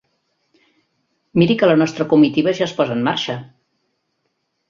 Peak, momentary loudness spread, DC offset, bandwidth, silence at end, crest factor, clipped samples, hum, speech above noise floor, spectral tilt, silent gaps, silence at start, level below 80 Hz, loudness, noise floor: -2 dBFS; 9 LU; under 0.1%; 7.4 kHz; 1.25 s; 18 dB; under 0.1%; none; 55 dB; -6.5 dB/octave; none; 1.35 s; -58 dBFS; -17 LUFS; -71 dBFS